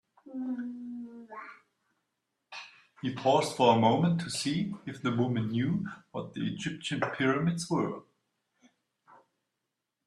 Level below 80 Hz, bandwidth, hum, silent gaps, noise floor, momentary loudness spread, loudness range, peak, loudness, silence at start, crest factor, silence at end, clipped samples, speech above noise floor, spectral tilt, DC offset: -70 dBFS; 12.5 kHz; none; none; -85 dBFS; 20 LU; 6 LU; -10 dBFS; -30 LUFS; 0.25 s; 22 dB; 2.05 s; under 0.1%; 56 dB; -5.5 dB/octave; under 0.1%